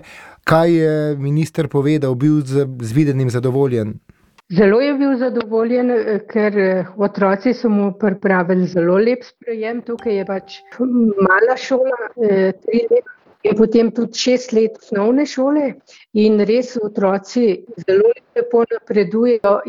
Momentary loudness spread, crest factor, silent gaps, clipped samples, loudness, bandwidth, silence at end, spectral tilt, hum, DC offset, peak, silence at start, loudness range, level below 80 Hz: 8 LU; 14 dB; none; under 0.1%; -17 LUFS; 12 kHz; 0 s; -7 dB/octave; none; under 0.1%; -2 dBFS; 0.1 s; 1 LU; -56 dBFS